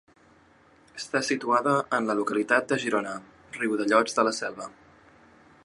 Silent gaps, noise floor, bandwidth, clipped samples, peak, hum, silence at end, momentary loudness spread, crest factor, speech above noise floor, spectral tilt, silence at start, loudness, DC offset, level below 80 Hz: none; -58 dBFS; 11.5 kHz; under 0.1%; -6 dBFS; none; 0.9 s; 17 LU; 22 dB; 32 dB; -4 dB/octave; 0.95 s; -26 LUFS; under 0.1%; -72 dBFS